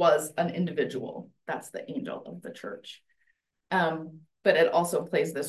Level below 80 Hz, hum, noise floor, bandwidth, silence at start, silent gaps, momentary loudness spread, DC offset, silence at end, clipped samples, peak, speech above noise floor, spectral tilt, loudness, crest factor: -76 dBFS; none; -73 dBFS; 12.5 kHz; 0 s; none; 18 LU; under 0.1%; 0 s; under 0.1%; -8 dBFS; 44 dB; -5 dB/octave; -28 LUFS; 22 dB